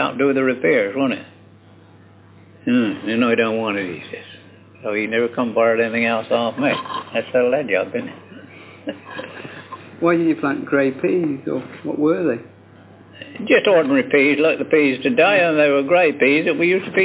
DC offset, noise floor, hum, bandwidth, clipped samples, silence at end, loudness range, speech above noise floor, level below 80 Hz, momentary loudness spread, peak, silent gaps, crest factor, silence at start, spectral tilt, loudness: under 0.1%; -47 dBFS; none; 4 kHz; under 0.1%; 0 s; 7 LU; 29 dB; -64 dBFS; 18 LU; -2 dBFS; none; 18 dB; 0 s; -9.5 dB/octave; -18 LUFS